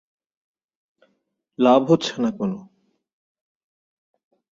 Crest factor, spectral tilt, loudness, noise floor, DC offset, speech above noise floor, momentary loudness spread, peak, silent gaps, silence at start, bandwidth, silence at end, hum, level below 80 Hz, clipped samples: 22 dB; -6 dB/octave; -20 LUFS; -72 dBFS; under 0.1%; 53 dB; 12 LU; -2 dBFS; none; 1.6 s; 7.6 kHz; 1.95 s; none; -68 dBFS; under 0.1%